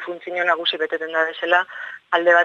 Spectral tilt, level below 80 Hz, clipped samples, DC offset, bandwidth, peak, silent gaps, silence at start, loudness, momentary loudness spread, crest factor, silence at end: -3 dB/octave; -80 dBFS; under 0.1%; under 0.1%; 7 kHz; -2 dBFS; none; 0 s; -20 LUFS; 9 LU; 18 dB; 0 s